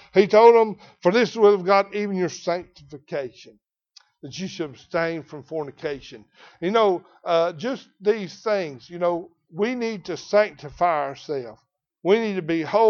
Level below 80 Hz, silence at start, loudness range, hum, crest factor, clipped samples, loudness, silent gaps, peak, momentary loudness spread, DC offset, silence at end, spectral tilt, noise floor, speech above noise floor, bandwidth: -62 dBFS; 0.15 s; 10 LU; none; 20 dB; under 0.1%; -22 LUFS; none; -2 dBFS; 15 LU; under 0.1%; 0 s; -5.5 dB/octave; -57 dBFS; 35 dB; 7 kHz